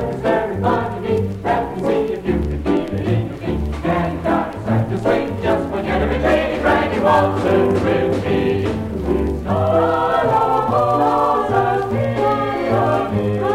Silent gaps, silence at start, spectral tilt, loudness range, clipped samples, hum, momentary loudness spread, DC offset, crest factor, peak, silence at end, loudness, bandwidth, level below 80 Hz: none; 0 s; -7.5 dB/octave; 3 LU; under 0.1%; none; 5 LU; under 0.1%; 14 dB; -2 dBFS; 0 s; -18 LUFS; 15.5 kHz; -32 dBFS